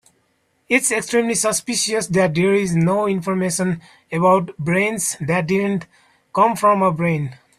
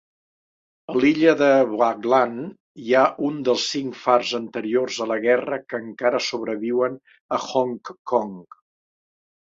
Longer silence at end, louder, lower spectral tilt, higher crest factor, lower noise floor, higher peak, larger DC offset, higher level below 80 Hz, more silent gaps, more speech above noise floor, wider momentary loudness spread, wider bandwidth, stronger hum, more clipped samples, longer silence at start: second, 0.25 s vs 1.05 s; first, -18 LUFS vs -21 LUFS; about the same, -4.5 dB/octave vs -4.5 dB/octave; about the same, 18 dB vs 20 dB; second, -65 dBFS vs under -90 dBFS; about the same, -2 dBFS vs -2 dBFS; neither; first, -56 dBFS vs -68 dBFS; second, none vs 2.60-2.75 s, 7.21-7.29 s, 7.99-8.05 s; second, 46 dB vs over 69 dB; second, 7 LU vs 12 LU; first, 15 kHz vs 7.8 kHz; neither; neither; second, 0.7 s vs 0.9 s